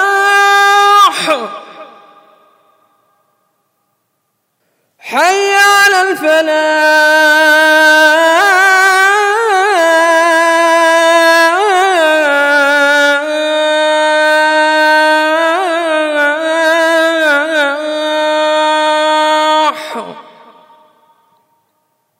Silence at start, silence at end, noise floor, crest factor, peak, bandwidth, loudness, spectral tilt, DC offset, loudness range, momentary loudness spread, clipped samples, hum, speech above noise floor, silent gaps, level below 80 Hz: 0 s; 2 s; -66 dBFS; 10 dB; 0 dBFS; 16.5 kHz; -9 LUFS; -0.5 dB/octave; under 0.1%; 7 LU; 7 LU; under 0.1%; none; 56 dB; none; -80 dBFS